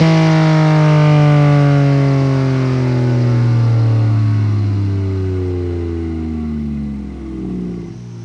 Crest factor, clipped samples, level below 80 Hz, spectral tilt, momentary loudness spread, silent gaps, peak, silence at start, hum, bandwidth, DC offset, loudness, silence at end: 12 dB; under 0.1%; -36 dBFS; -8.5 dB/octave; 13 LU; none; 0 dBFS; 0 s; none; 7.4 kHz; under 0.1%; -14 LUFS; 0 s